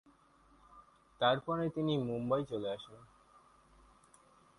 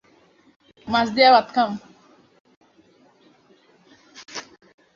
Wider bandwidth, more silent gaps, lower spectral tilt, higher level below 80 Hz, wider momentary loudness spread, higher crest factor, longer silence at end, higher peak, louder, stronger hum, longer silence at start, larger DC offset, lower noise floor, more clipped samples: first, 11.5 kHz vs 7.4 kHz; second, none vs 2.40-2.45 s, 2.57-2.61 s; first, -7 dB/octave vs -4 dB/octave; second, -70 dBFS vs -62 dBFS; second, 10 LU vs 22 LU; about the same, 22 dB vs 22 dB; first, 1.55 s vs 0.55 s; second, -18 dBFS vs -2 dBFS; second, -35 LUFS vs -18 LUFS; neither; about the same, 0.75 s vs 0.85 s; neither; first, -66 dBFS vs -57 dBFS; neither